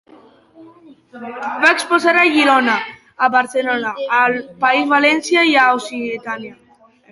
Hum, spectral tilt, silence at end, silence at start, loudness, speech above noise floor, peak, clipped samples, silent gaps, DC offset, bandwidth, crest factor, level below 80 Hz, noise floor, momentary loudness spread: none; -2.5 dB/octave; 0.6 s; 0.6 s; -15 LUFS; 31 dB; 0 dBFS; under 0.1%; none; under 0.1%; 11.5 kHz; 16 dB; -66 dBFS; -47 dBFS; 15 LU